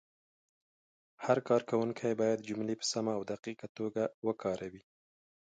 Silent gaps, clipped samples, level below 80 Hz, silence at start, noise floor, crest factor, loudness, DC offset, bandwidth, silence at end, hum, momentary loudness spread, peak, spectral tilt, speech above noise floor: 3.39-3.43 s, 3.69-3.75 s, 4.14-4.22 s; under 0.1%; -76 dBFS; 1.2 s; under -90 dBFS; 22 dB; -35 LUFS; under 0.1%; 9.4 kHz; 0.6 s; none; 11 LU; -14 dBFS; -5 dB/octave; over 56 dB